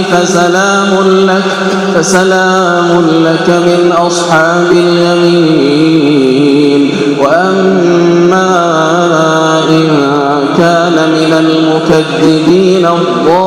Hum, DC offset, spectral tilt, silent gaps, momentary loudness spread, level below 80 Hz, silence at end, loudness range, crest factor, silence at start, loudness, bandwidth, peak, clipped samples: none; under 0.1%; -5 dB/octave; none; 2 LU; -48 dBFS; 0 s; 1 LU; 8 dB; 0 s; -8 LUFS; 13 kHz; 0 dBFS; 2%